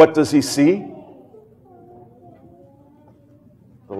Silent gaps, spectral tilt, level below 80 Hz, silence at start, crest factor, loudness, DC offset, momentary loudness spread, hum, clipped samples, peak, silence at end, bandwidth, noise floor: none; -5.5 dB/octave; -62 dBFS; 0 s; 20 dB; -17 LUFS; under 0.1%; 23 LU; none; under 0.1%; 0 dBFS; 0 s; 14 kHz; -50 dBFS